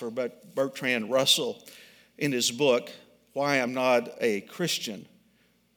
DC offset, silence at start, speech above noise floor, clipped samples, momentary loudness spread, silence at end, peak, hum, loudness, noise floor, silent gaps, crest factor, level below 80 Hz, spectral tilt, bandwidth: under 0.1%; 0 s; 38 dB; under 0.1%; 13 LU; 0.7 s; -8 dBFS; none; -27 LUFS; -66 dBFS; none; 20 dB; -80 dBFS; -3 dB/octave; 19.5 kHz